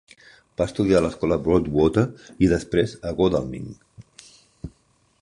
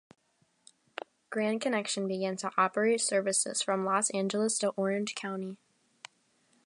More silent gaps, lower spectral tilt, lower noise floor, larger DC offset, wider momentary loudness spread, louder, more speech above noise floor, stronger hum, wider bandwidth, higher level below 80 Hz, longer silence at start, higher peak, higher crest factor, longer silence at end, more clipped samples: neither; first, -7 dB/octave vs -3 dB/octave; second, -63 dBFS vs -70 dBFS; neither; first, 20 LU vs 17 LU; first, -22 LUFS vs -30 LUFS; about the same, 42 dB vs 40 dB; neither; about the same, 11 kHz vs 11.5 kHz; first, -42 dBFS vs -84 dBFS; second, 0.6 s vs 1.3 s; first, -4 dBFS vs -14 dBFS; about the same, 18 dB vs 20 dB; second, 0.5 s vs 1.1 s; neither